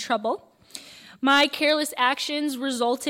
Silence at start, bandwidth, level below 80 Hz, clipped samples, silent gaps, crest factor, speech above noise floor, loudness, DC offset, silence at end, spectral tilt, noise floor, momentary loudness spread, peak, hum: 0 s; 16.5 kHz; -70 dBFS; under 0.1%; none; 16 dB; 21 dB; -23 LUFS; under 0.1%; 0 s; -1.5 dB/octave; -45 dBFS; 21 LU; -8 dBFS; none